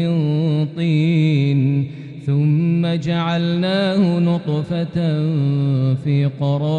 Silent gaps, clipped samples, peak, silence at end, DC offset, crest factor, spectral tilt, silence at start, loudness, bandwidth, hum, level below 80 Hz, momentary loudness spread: none; under 0.1%; -6 dBFS; 0 s; under 0.1%; 12 dB; -8.5 dB/octave; 0 s; -18 LUFS; 7 kHz; none; -54 dBFS; 5 LU